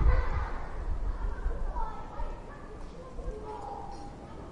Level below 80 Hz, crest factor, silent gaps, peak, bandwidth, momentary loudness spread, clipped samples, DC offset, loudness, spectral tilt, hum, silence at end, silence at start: -34 dBFS; 20 dB; none; -12 dBFS; 7.6 kHz; 10 LU; under 0.1%; under 0.1%; -39 LUFS; -7.5 dB/octave; none; 0 s; 0 s